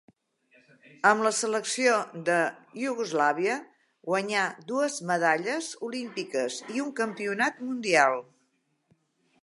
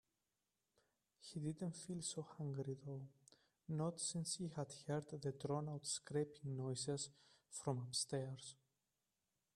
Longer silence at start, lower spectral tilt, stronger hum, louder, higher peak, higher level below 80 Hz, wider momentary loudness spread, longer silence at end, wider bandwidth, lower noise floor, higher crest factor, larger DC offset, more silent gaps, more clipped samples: second, 1.05 s vs 1.2 s; second, -3 dB/octave vs -4.5 dB/octave; neither; first, -27 LUFS vs -46 LUFS; first, -6 dBFS vs -28 dBFS; about the same, -84 dBFS vs -82 dBFS; about the same, 11 LU vs 11 LU; first, 1.2 s vs 1 s; second, 11.5 kHz vs 13 kHz; second, -73 dBFS vs under -90 dBFS; about the same, 22 dB vs 20 dB; neither; neither; neither